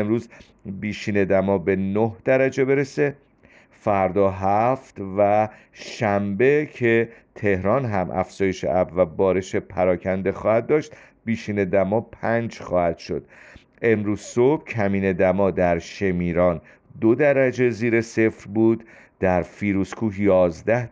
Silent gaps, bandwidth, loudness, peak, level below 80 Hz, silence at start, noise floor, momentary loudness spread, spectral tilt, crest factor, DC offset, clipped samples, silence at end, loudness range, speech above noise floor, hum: none; 9.4 kHz; -22 LUFS; -6 dBFS; -52 dBFS; 0 s; -53 dBFS; 9 LU; -7.5 dB/octave; 16 dB; under 0.1%; under 0.1%; 0.05 s; 2 LU; 32 dB; none